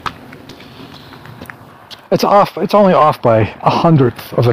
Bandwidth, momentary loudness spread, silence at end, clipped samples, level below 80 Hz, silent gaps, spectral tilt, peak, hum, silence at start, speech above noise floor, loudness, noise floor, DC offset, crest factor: 15.5 kHz; 23 LU; 0 s; under 0.1%; -44 dBFS; none; -7.5 dB/octave; 0 dBFS; none; 0.05 s; 26 dB; -12 LUFS; -37 dBFS; under 0.1%; 14 dB